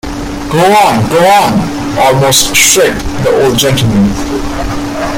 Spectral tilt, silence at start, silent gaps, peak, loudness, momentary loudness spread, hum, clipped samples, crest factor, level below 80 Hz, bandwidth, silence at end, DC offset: -3.5 dB/octave; 0.05 s; none; 0 dBFS; -8 LUFS; 11 LU; none; 0.2%; 10 dB; -26 dBFS; over 20 kHz; 0 s; under 0.1%